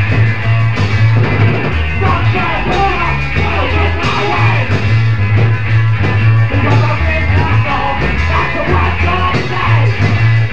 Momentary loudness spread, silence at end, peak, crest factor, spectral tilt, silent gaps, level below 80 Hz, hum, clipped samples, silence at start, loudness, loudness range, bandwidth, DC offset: 3 LU; 0 s; 0 dBFS; 12 dB; -7 dB/octave; none; -24 dBFS; none; under 0.1%; 0 s; -12 LUFS; 1 LU; 7 kHz; 8%